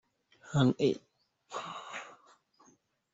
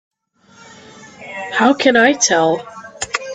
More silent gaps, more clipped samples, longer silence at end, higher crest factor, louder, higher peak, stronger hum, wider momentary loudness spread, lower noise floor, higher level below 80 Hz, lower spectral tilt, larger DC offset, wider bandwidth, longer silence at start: neither; neither; first, 1 s vs 0 s; about the same, 22 dB vs 18 dB; second, -33 LUFS vs -14 LUFS; second, -12 dBFS vs 0 dBFS; neither; about the same, 17 LU vs 19 LU; first, -68 dBFS vs -50 dBFS; second, -66 dBFS vs -58 dBFS; first, -6.5 dB/octave vs -2.5 dB/octave; neither; second, 8 kHz vs 10 kHz; second, 0.45 s vs 1 s